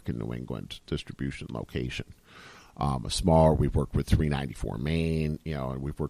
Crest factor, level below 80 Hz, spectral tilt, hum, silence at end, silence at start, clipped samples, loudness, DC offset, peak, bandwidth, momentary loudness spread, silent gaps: 18 dB; -38 dBFS; -6.5 dB/octave; none; 0 s; 0.05 s; under 0.1%; -29 LUFS; under 0.1%; -10 dBFS; 14 kHz; 15 LU; none